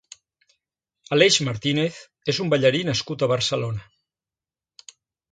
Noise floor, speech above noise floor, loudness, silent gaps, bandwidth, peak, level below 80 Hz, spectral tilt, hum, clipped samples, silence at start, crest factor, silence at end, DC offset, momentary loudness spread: under -90 dBFS; over 68 dB; -22 LUFS; none; 9.4 kHz; -2 dBFS; -58 dBFS; -4 dB/octave; none; under 0.1%; 1.1 s; 22 dB; 1.5 s; under 0.1%; 11 LU